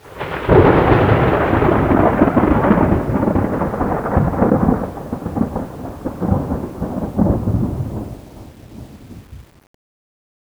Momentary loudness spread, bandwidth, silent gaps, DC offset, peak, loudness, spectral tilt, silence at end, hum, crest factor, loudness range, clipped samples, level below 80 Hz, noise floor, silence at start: 15 LU; over 20 kHz; none; under 0.1%; 0 dBFS; -16 LUFS; -9 dB/octave; 1.15 s; none; 16 dB; 10 LU; under 0.1%; -30 dBFS; -38 dBFS; 0.05 s